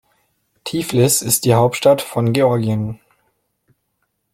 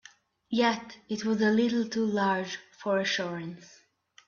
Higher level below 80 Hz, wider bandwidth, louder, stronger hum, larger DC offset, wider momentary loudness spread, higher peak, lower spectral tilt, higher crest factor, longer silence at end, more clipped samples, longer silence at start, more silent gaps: first, -52 dBFS vs -72 dBFS; first, 16.5 kHz vs 7.2 kHz; first, -16 LUFS vs -29 LUFS; neither; neither; about the same, 13 LU vs 13 LU; first, -2 dBFS vs -12 dBFS; about the same, -5 dB/octave vs -5 dB/octave; about the same, 18 dB vs 18 dB; first, 1.4 s vs 0.6 s; neither; first, 0.65 s vs 0.5 s; neither